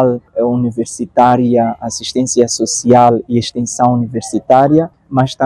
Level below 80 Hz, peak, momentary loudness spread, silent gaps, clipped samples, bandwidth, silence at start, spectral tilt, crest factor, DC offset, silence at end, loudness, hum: -50 dBFS; 0 dBFS; 9 LU; none; 0.5%; 12 kHz; 0 s; -5.5 dB/octave; 12 dB; under 0.1%; 0 s; -13 LUFS; none